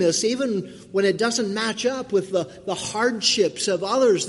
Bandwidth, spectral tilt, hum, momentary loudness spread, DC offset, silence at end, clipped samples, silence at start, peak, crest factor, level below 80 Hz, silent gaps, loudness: 11.5 kHz; -3 dB/octave; none; 8 LU; under 0.1%; 0 s; under 0.1%; 0 s; -8 dBFS; 16 dB; -64 dBFS; none; -22 LUFS